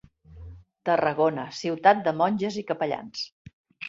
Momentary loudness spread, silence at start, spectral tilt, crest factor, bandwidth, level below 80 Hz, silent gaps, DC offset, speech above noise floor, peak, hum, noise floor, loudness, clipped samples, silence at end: 14 LU; 0.3 s; -5.5 dB/octave; 22 dB; 7.8 kHz; -56 dBFS; 3.32-3.45 s, 3.53-3.64 s; under 0.1%; 21 dB; -4 dBFS; none; -45 dBFS; -25 LUFS; under 0.1%; 0 s